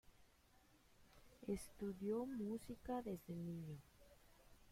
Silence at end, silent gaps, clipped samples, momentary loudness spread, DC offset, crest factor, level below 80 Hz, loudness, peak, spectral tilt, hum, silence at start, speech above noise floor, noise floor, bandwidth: 0 s; none; under 0.1%; 9 LU; under 0.1%; 18 dB; -70 dBFS; -49 LUFS; -32 dBFS; -7 dB/octave; none; 0.05 s; 25 dB; -73 dBFS; 16.5 kHz